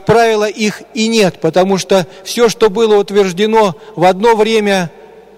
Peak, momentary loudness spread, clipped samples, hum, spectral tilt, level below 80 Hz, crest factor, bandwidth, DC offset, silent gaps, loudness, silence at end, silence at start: -2 dBFS; 6 LU; under 0.1%; none; -4.5 dB/octave; -46 dBFS; 10 dB; 15.5 kHz; under 0.1%; none; -12 LUFS; 0.5 s; 0.05 s